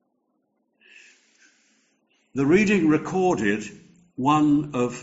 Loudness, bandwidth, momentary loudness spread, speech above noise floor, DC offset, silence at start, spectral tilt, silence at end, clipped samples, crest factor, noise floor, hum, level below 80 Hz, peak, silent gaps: -21 LUFS; 8 kHz; 14 LU; 51 dB; under 0.1%; 2.35 s; -6 dB/octave; 0 s; under 0.1%; 18 dB; -72 dBFS; none; -58 dBFS; -6 dBFS; none